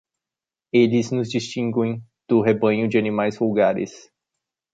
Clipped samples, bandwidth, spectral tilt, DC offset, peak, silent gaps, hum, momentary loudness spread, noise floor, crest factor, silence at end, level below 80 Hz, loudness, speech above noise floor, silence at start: under 0.1%; 7.8 kHz; -6.5 dB/octave; under 0.1%; -4 dBFS; none; none; 8 LU; -89 dBFS; 16 dB; 0.75 s; -64 dBFS; -21 LUFS; 69 dB; 0.75 s